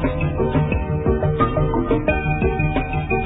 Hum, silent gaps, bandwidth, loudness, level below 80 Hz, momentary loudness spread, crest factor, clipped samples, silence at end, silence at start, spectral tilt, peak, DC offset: none; none; 4 kHz; -20 LUFS; -28 dBFS; 3 LU; 16 dB; under 0.1%; 0 s; 0 s; -12 dB/octave; -4 dBFS; under 0.1%